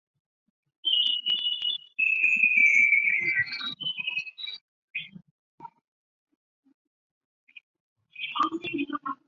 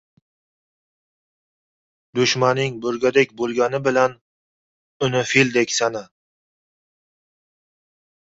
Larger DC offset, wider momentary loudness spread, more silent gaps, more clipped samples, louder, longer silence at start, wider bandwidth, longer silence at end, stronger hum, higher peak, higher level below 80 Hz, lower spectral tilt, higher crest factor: neither; first, 19 LU vs 7 LU; first, 4.61-4.94 s, 5.31-5.58 s, 5.81-6.27 s, 6.35-6.63 s, 6.74-7.47 s, 7.63-7.74 s, 7.80-7.96 s vs 4.21-5.00 s; neither; second, -23 LUFS vs -19 LUFS; second, 0.85 s vs 2.15 s; about the same, 7.4 kHz vs 8 kHz; second, 0.15 s vs 2.35 s; neither; second, -10 dBFS vs -2 dBFS; second, -76 dBFS vs -62 dBFS; second, -1.5 dB/octave vs -4 dB/octave; about the same, 18 dB vs 20 dB